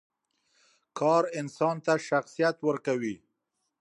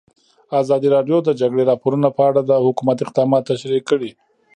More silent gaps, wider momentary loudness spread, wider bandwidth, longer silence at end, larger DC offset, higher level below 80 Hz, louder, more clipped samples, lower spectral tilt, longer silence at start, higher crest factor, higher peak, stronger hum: neither; first, 9 LU vs 6 LU; first, 11.5 kHz vs 9.4 kHz; first, 0.65 s vs 0.45 s; neither; second, -78 dBFS vs -68 dBFS; second, -28 LUFS vs -17 LUFS; neither; second, -5.5 dB/octave vs -7.5 dB/octave; first, 0.95 s vs 0.5 s; about the same, 18 dB vs 16 dB; second, -12 dBFS vs -2 dBFS; neither